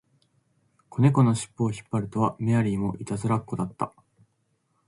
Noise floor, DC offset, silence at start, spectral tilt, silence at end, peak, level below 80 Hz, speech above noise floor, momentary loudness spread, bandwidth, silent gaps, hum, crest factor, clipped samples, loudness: -72 dBFS; under 0.1%; 0.9 s; -7.5 dB/octave; 1 s; -8 dBFS; -56 dBFS; 47 dB; 11 LU; 11.5 kHz; none; none; 18 dB; under 0.1%; -26 LUFS